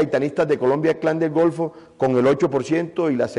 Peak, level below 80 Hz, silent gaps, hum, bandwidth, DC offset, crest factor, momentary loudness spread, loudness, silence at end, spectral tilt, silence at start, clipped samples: -10 dBFS; -58 dBFS; none; none; 11 kHz; under 0.1%; 10 dB; 5 LU; -20 LUFS; 0 s; -7.5 dB/octave; 0 s; under 0.1%